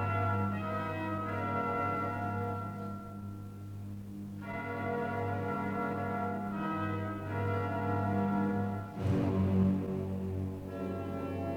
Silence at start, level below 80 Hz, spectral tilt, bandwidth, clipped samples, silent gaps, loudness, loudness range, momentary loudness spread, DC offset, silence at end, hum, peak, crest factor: 0 s; -60 dBFS; -9 dB/octave; 17.5 kHz; under 0.1%; none; -35 LUFS; 6 LU; 12 LU; under 0.1%; 0 s; none; -18 dBFS; 16 dB